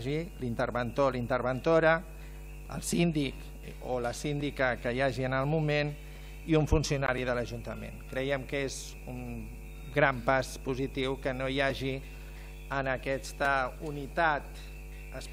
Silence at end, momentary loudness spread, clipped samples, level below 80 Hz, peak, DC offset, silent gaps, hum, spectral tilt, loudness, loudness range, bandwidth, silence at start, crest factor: 0 s; 18 LU; under 0.1%; -44 dBFS; -12 dBFS; under 0.1%; none; none; -5.5 dB/octave; -31 LUFS; 3 LU; 16 kHz; 0 s; 20 dB